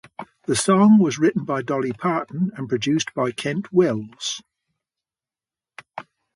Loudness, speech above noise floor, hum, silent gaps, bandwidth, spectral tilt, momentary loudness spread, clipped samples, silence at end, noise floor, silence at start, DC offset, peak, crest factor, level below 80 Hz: -21 LUFS; over 70 dB; none; none; 11.5 kHz; -5.5 dB/octave; 20 LU; under 0.1%; 0.35 s; under -90 dBFS; 0.2 s; under 0.1%; -6 dBFS; 16 dB; -62 dBFS